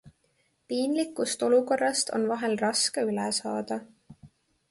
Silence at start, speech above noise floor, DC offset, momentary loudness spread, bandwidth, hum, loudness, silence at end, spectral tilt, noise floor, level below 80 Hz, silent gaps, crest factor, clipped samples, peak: 0.05 s; 44 dB; under 0.1%; 9 LU; 11.5 kHz; none; -27 LUFS; 0.45 s; -3 dB/octave; -71 dBFS; -72 dBFS; none; 16 dB; under 0.1%; -12 dBFS